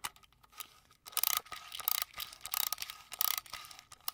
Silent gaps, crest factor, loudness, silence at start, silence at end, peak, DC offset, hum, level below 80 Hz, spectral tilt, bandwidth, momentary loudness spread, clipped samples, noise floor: none; 32 dB; -35 LUFS; 0.05 s; 0 s; -8 dBFS; under 0.1%; none; -72 dBFS; 2.5 dB/octave; 19 kHz; 17 LU; under 0.1%; -62 dBFS